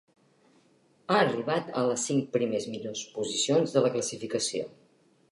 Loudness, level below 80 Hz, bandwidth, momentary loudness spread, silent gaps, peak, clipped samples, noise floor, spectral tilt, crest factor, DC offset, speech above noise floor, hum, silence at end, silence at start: -28 LUFS; -76 dBFS; 11.5 kHz; 11 LU; none; -10 dBFS; under 0.1%; -64 dBFS; -4 dB/octave; 20 dB; under 0.1%; 36 dB; none; 0.6 s; 1.1 s